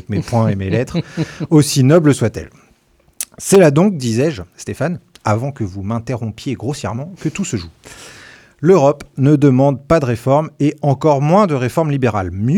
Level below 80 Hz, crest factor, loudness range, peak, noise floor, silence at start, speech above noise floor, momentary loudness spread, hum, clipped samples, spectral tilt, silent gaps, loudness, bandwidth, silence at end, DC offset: -46 dBFS; 14 dB; 8 LU; 0 dBFS; -54 dBFS; 0.1 s; 39 dB; 13 LU; none; under 0.1%; -6.5 dB/octave; none; -15 LUFS; 16.5 kHz; 0 s; under 0.1%